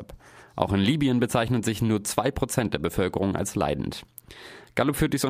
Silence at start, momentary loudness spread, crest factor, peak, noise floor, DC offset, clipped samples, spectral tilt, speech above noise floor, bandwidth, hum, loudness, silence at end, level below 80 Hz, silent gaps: 0 s; 18 LU; 22 dB; -4 dBFS; -47 dBFS; under 0.1%; under 0.1%; -5.5 dB/octave; 22 dB; 15.5 kHz; none; -26 LUFS; 0 s; -44 dBFS; none